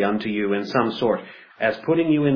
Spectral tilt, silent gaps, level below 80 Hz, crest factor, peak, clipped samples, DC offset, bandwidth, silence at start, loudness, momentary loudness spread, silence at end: -8 dB/octave; none; -64 dBFS; 16 dB; -6 dBFS; under 0.1%; under 0.1%; 5.4 kHz; 0 s; -22 LUFS; 5 LU; 0 s